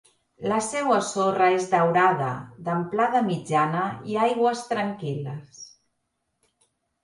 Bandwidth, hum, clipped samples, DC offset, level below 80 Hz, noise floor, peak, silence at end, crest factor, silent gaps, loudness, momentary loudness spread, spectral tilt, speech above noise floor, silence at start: 11.5 kHz; none; under 0.1%; under 0.1%; -68 dBFS; -77 dBFS; -8 dBFS; 1.35 s; 18 dB; none; -24 LUFS; 12 LU; -5.5 dB/octave; 53 dB; 0.4 s